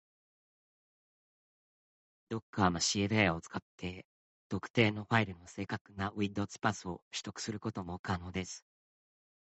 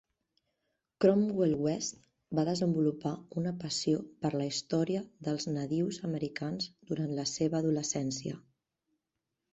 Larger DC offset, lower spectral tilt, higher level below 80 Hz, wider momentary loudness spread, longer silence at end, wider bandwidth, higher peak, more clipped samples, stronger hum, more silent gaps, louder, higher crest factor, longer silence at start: neither; about the same, -4.5 dB/octave vs -5.5 dB/octave; about the same, -68 dBFS vs -68 dBFS; first, 14 LU vs 8 LU; second, 0.9 s vs 1.15 s; about the same, 8.2 kHz vs 8.4 kHz; about the same, -12 dBFS vs -12 dBFS; neither; neither; first, 2.42-2.53 s, 3.62-3.78 s, 4.04-4.50 s, 4.70-4.74 s, 5.81-5.85 s, 7.02-7.11 s, 7.99-8.04 s vs none; about the same, -35 LUFS vs -33 LUFS; about the same, 24 dB vs 22 dB; first, 2.3 s vs 1 s